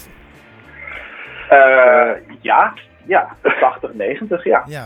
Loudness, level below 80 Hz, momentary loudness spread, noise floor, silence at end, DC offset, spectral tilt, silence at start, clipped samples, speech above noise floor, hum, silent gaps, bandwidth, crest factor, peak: -14 LUFS; -52 dBFS; 22 LU; -43 dBFS; 0 s; under 0.1%; -6 dB/octave; 0.8 s; under 0.1%; 29 dB; none; none; 8.8 kHz; 16 dB; 0 dBFS